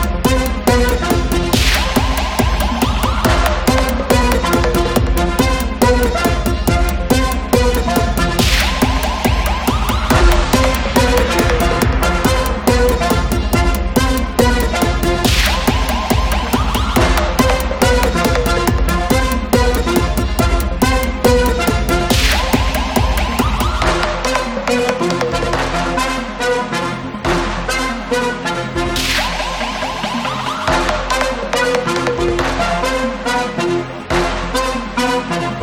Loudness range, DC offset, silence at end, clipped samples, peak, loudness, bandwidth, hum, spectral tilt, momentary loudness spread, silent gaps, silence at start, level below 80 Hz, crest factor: 3 LU; under 0.1%; 0 s; under 0.1%; 0 dBFS; -15 LUFS; 18 kHz; none; -4.5 dB/octave; 5 LU; none; 0 s; -20 dBFS; 14 dB